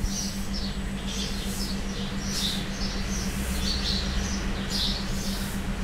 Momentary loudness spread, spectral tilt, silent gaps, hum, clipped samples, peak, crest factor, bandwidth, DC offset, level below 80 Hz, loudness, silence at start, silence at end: 5 LU; -3.5 dB/octave; none; none; under 0.1%; -14 dBFS; 14 dB; 16 kHz; under 0.1%; -32 dBFS; -29 LUFS; 0 s; 0 s